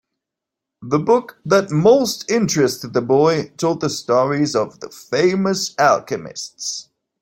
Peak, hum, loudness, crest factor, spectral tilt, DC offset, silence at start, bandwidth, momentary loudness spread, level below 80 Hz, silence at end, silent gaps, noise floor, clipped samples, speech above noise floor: -2 dBFS; none; -18 LUFS; 16 dB; -5 dB/octave; under 0.1%; 0.8 s; 16.5 kHz; 12 LU; -58 dBFS; 0.4 s; none; -84 dBFS; under 0.1%; 66 dB